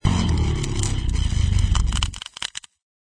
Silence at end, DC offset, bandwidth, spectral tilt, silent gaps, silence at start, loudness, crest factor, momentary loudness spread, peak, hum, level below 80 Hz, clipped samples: 0.45 s; under 0.1%; 11 kHz; -4.5 dB/octave; none; 0.05 s; -23 LUFS; 18 dB; 9 LU; -4 dBFS; none; -24 dBFS; under 0.1%